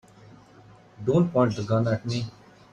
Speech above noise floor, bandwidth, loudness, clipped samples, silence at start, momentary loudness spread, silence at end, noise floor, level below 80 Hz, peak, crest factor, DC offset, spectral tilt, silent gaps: 28 dB; 9.2 kHz; -25 LUFS; under 0.1%; 1 s; 10 LU; 0.4 s; -52 dBFS; -58 dBFS; -10 dBFS; 18 dB; under 0.1%; -7.5 dB/octave; none